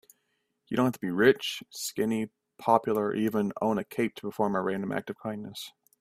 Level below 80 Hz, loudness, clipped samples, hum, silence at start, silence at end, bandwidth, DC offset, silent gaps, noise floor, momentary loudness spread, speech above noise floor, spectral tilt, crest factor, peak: -68 dBFS; -29 LUFS; under 0.1%; none; 0.7 s; 0.3 s; 16 kHz; under 0.1%; none; -77 dBFS; 13 LU; 49 dB; -5 dB/octave; 22 dB; -6 dBFS